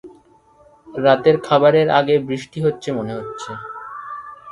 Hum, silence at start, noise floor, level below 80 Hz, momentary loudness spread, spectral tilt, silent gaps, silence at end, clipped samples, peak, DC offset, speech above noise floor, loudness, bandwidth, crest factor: none; 0.05 s; -52 dBFS; -58 dBFS; 18 LU; -6.5 dB/octave; none; 0 s; under 0.1%; 0 dBFS; under 0.1%; 35 dB; -17 LUFS; 11.5 kHz; 18 dB